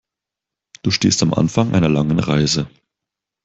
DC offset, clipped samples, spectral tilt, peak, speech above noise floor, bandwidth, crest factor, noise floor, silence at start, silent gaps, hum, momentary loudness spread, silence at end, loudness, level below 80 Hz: under 0.1%; under 0.1%; -5 dB/octave; -2 dBFS; 69 dB; 8.2 kHz; 16 dB; -85 dBFS; 0.85 s; none; none; 6 LU; 0.8 s; -17 LUFS; -46 dBFS